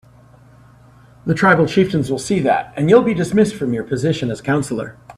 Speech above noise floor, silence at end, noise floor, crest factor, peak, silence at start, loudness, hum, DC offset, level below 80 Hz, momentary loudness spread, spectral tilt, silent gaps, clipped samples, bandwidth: 30 dB; 0.05 s; -46 dBFS; 18 dB; 0 dBFS; 1.25 s; -17 LUFS; none; under 0.1%; -50 dBFS; 9 LU; -6.5 dB/octave; none; under 0.1%; 13.5 kHz